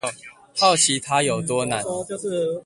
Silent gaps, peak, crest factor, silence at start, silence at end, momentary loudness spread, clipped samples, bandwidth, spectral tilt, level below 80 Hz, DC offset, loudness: none; -2 dBFS; 20 dB; 0.05 s; 0.05 s; 13 LU; under 0.1%; 11.5 kHz; -2.5 dB/octave; -60 dBFS; under 0.1%; -21 LUFS